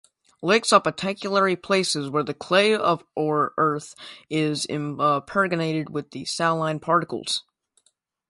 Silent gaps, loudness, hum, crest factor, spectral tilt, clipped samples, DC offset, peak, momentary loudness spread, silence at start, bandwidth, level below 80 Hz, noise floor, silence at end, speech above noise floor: none; -23 LUFS; none; 22 dB; -4 dB/octave; under 0.1%; under 0.1%; -2 dBFS; 10 LU; 0.4 s; 11.5 kHz; -66 dBFS; -68 dBFS; 0.9 s; 45 dB